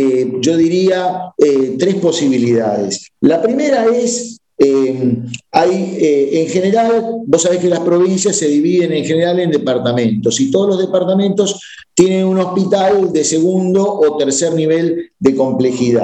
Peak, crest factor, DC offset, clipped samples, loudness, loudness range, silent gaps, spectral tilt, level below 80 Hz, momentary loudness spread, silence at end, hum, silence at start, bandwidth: 0 dBFS; 12 dB; under 0.1%; under 0.1%; -14 LUFS; 1 LU; none; -5 dB/octave; -58 dBFS; 4 LU; 0 s; none; 0 s; 9.4 kHz